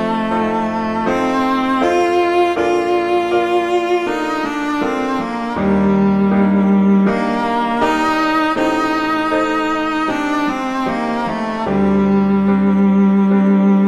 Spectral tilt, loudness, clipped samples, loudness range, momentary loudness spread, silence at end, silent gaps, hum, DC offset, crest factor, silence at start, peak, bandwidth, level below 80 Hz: -7 dB/octave; -16 LUFS; under 0.1%; 3 LU; 6 LU; 0 s; none; none; under 0.1%; 12 dB; 0 s; -2 dBFS; 10.5 kHz; -42 dBFS